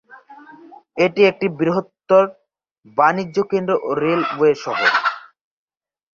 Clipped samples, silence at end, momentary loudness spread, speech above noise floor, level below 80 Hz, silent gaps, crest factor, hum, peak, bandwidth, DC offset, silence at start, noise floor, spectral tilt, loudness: under 0.1%; 0.95 s; 8 LU; 26 dB; -64 dBFS; 2.71-2.75 s; 18 dB; none; -2 dBFS; 7.2 kHz; under 0.1%; 0.3 s; -43 dBFS; -6 dB/octave; -18 LUFS